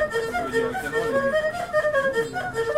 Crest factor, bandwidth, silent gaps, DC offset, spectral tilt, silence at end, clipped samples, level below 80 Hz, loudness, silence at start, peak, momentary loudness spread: 14 dB; 16 kHz; none; 0.2%; -4.5 dB/octave; 0 s; under 0.1%; -50 dBFS; -24 LUFS; 0 s; -10 dBFS; 4 LU